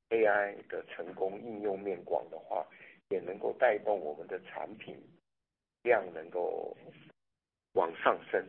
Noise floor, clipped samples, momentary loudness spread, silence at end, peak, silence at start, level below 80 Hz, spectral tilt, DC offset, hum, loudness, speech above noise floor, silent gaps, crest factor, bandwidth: -89 dBFS; under 0.1%; 15 LU; 0 s; -10 dBFS; 0.1 s; -82 dBFS; -8 dB/octave; under 0.1%; none; -34 LUFS; 55 dB; none; 26 dB; 4.2 kHz